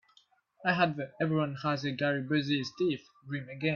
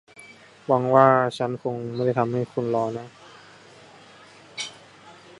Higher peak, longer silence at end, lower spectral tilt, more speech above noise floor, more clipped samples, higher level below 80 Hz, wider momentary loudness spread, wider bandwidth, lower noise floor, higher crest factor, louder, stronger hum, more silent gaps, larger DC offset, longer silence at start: second, -12 dBFS vs -2 dBFS; second, 0 s vs 0.25 s; about the same, -6.5 dB/octave vs -6.5 dB/octave; first, 36 dB vs 27 dB; neither; about the same, -72 dBFS vs -68 dBFS; second, 11 LU vs 20 LU; second, 7 kHz vs 11.5 kHz; first, -67 dBFS vs -49 dBFS; about the same, 20 dB vs 24 dB; second, -32 LUFS vs -23 LUFS; neither; neither; neither; first, 0.6 s vs 0.2 s